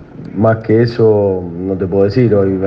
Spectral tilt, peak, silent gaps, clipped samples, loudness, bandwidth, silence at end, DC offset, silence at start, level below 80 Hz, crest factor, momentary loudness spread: -10 dB/octave; 0 dBFS; none; under 0.1%; -13 LUFS; 6 kHz; 0 s; under 0.1%; 0 s; -46 dBFS; 12 dB; 8 LU